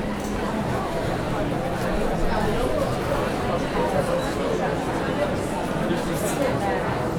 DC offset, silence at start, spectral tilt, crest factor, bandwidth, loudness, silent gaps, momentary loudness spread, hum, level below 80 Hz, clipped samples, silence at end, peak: under 0.1%; 0 s; -6 dB/octave; 14 dB; over 20 kHz; -25 LUFS; none; 3 LU; none; -34 dBFS; under 0.1%; 0 s; -10 dBFS